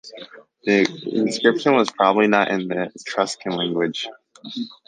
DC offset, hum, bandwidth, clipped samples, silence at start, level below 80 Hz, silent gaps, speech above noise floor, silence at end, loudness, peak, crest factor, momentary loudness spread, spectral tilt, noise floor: under 0.1%; none; 9.6 kHz; under 0.1%; 0.05 s; -68 dBFS; none; 22 dB; 0.15 s; -20 LUFS; -2 dBFS; 20 dB; 15 LU; -4.5 dB/octave; -42 dBFS